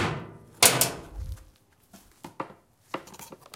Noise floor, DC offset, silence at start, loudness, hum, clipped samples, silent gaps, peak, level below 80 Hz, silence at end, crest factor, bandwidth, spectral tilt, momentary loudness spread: -59 dBFS; under 0.1%; 0 s; -21 LUFS; none; under 0.1%; none; 0 dBFS; -48 dBFS; 0.2 s; 30 dB; 17 kHz; -1.5 dB/octave; 26 LU